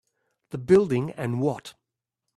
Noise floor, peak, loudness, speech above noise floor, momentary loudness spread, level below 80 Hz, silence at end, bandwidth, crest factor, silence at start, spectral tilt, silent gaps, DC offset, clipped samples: -83 dBFS; -6 dBFS; -24 LUFS; 60 dB; 17 LU; -60 dBFS; 0.65 s; 12 kHz; 20 dB; 0.55 s; -8 dB/octave; none; under 0.1%; under 0.1%